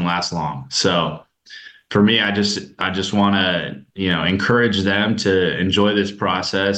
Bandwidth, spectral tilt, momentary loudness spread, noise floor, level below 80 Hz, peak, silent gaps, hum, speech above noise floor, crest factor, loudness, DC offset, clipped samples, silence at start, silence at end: 9 kHz; -4.5 dB/octave; 9 LU; -41 dBFS; -52 dBFS; -4 dBFS; none; none; 23 dB; 14 dB; -18 LUFS; under 0.1%; under 0.1%; 0 s; 0 s